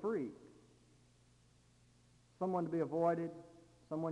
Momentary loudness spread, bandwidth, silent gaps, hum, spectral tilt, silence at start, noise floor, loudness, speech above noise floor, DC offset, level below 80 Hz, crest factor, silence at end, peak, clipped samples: 22 LU; 11 kHz; none; 60 Hz at -70 dBFS; -9 dB/octave; 0 s; -69 dBFS; -39 LUFS; 31 dB; under 0.1%; -76 dBFS; 20 dB; 0 s; -22 dBFS; under 0.1%